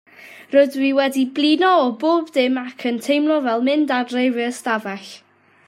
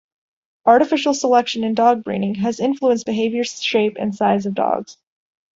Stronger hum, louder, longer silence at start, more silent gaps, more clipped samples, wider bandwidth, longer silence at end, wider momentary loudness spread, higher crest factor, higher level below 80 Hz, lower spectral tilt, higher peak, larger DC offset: neither; about the same, -18 LUFS vs -18 LUFS; second, 0.2 s vs 0.65 s; neither; neither; first, 15 kHz vs 8 kHz; second, 0.5 s vs 0.65 s; about the same, 8 LU vs 7 LU; about the same, 16 dB vs 18 dB; second, -76 dBFS vs -62 dBFS; about the same, -4 dB/octave vs -4.5 dB/octave; about the same, -2 dBFS vs 0 dBFS; neither